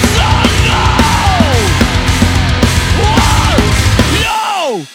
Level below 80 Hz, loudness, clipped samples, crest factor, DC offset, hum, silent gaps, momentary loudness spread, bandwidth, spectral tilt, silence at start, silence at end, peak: -16 dBFS; -10 LUFS; under 0.1%; 10 dB; under 0.1%; none; none; 2 LU; 17 kHz; -4.5 dB/octave; 0 s; 0 s; 0 dBFS